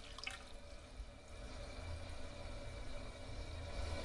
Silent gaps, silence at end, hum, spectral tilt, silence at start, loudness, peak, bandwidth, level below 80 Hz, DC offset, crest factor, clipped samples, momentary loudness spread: none; 0 s; none; -4.5 dB/octave; 0 s; -51 LUFS; -30 dBFS; 11.5 kHz; -52 dBFS; under 0.1%; 18 dB; under 0.1%; 8 LU